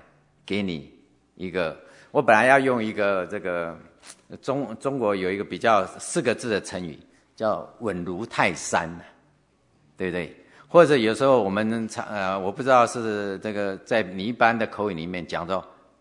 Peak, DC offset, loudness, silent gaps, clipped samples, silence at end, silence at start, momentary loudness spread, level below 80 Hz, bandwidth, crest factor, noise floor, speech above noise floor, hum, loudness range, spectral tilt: 0 dBFS; under 0.1%; -24 LUFS; none; under 0.1%; 0.3 s; 0.45 s; 14 LU; -66 dBFS; 11 kHz; 24 dB; -63 dBFS; 40 dB; none; 6 LU; -5 dB/octave